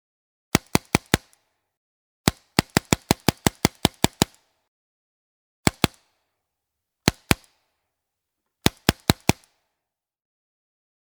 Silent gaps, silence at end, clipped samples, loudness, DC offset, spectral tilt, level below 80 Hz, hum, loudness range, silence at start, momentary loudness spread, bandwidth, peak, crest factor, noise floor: 1.77-2.24 s, 4.68-5.63 s; 1.75 s; under 0.1%; -23 LUFS; under 0.1%; -4 dB/octave; -42 dBFS; none; 4 LU; 0.55 s; 4 LU; over 20 kHz; 0 dBFS; 26 dB; -84 dBFS